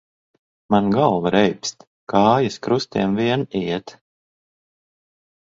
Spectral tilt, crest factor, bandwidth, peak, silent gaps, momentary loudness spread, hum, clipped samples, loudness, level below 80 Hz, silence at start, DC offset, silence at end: -6 dB/octave; 20 dB; 7.8 kHz; 0 dBFS; 1.87-2.07 s; 9 LU; none; under 0.1%; -20 LUFS; -56 dBFS; 0.7 s; under 0.1%; 1.6 s